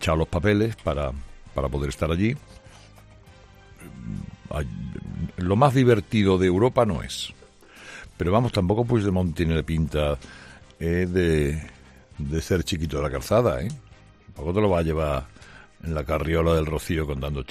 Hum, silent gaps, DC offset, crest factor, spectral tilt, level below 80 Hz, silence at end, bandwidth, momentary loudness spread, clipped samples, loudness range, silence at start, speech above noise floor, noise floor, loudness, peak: none; none; under 0.1%; 20 dB; -6.5 dB/octave; -38 dBFS; 0.05 s; 14 kHz; 16 LU; under 0.1%; 8 LU; 0 s; 26 dB; -49 dBFS; -24 LUFS; -4 dBFS